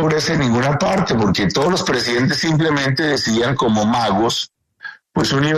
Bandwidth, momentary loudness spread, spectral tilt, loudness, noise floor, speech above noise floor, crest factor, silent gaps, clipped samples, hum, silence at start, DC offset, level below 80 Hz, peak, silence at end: 13.5 kHz; 6 LU; -5 dB/octave; -17 LUFS; -37 dBFS; 21 dB; 12 dB; none; under 0.1%; none; 0 s; under 0.1%; -44 dBFS; -4 dBFS; 0 s